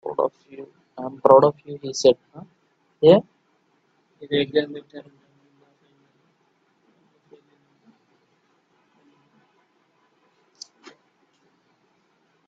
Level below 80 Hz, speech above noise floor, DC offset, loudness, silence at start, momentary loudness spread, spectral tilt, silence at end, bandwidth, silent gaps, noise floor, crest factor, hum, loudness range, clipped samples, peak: -68 dBFS; 46 dB; under 0.1%; -20 LUFS; 0.05 s; 28 LU; -5.5 dB/octave; 7.5 s; 8 kHz; none; -66 dBFS; 24 dB; none; 10 LU; under 0.1%; 0 dBFS